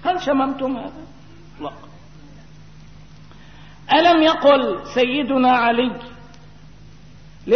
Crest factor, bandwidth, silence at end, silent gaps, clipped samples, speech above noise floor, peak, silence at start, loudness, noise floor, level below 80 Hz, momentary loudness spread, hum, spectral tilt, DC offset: 16 dB; 6.6 kHz; 0 s; none; under 0.1%; 27 dB; -4 dBFS; 0 s; -17 LUFS; -44 dBFS; -50 dBFS; 21 LU; none; -5 dB/octave; 0.6%